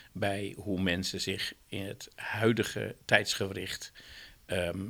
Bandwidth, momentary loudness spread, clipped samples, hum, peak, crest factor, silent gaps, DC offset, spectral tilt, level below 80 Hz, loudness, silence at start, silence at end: over 20 kHz; 14 LU; under 0.1%; none; -6 dBFS; 28 dB; none; under 0.1%; -4 dB/octave; -60 dBFS; -32 LUFS; 0 s; 0 s